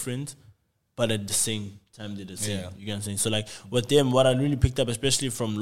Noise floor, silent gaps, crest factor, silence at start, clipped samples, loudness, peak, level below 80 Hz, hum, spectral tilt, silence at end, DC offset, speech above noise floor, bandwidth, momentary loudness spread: -60 dBFS; none; 20 dB; 0 s; under 0.1%; -25 LUFS; -6 dBFS; -42 dBFS; none; -4 dB/octave; 0 s; 0.4%; 34 dB; 16.5 kHz; 17 LU